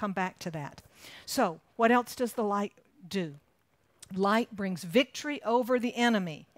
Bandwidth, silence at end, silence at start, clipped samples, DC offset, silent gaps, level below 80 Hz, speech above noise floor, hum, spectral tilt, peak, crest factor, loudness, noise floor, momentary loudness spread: 16 kHz; 0.15 s; 0 s; under 0.1%; under 0.1%; none; -72 dBFS; 41 dB; none; -5 dB/octave; -12 dBFS; 20 dB; -30 LUFS; -71 dBFS; 14 LU